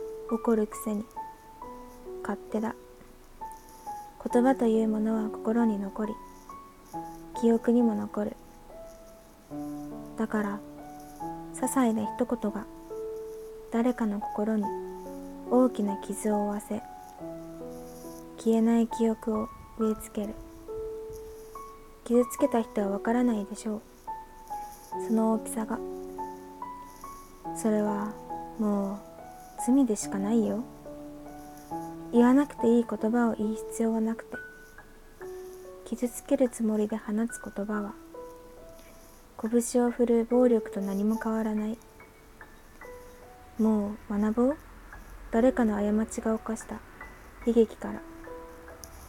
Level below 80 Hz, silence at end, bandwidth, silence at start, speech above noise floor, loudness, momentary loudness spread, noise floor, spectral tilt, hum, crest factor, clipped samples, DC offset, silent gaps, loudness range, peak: -54 dBFS; 0 s; 16.5 kHz; 0 s; 25 dB; -29 LUFS; 20 LU; -52 dBFS; -6 dB/octave; none; 20 dB; under 0.1%; under 0.1%; none; 6 LU; -10 dBFS